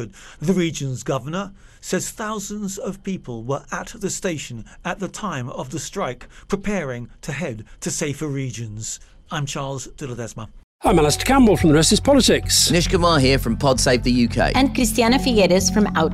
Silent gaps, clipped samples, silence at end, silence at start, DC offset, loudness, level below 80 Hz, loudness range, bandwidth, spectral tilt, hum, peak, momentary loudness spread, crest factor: 10.64-10.79 s; under 0.1%; 0 s; 0 s; under 0.1%; -20 LUFS; -34 dBFS; 12 LU; 16 kHz; -4 dB/octave; none; -6 dBFS; 16 LU; 14 dB